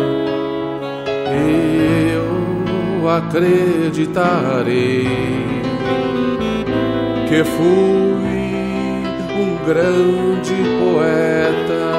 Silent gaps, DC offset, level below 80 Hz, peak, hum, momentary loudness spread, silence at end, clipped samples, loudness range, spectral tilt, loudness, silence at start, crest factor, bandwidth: none; under 0.1%; -42 dBFS; -2 dBFS; none; 6 LU; 0 s; under 0.1%; 1 LU; -7 dB/octave; -17 LUFS; 0 s; 14 dB; 15 kHz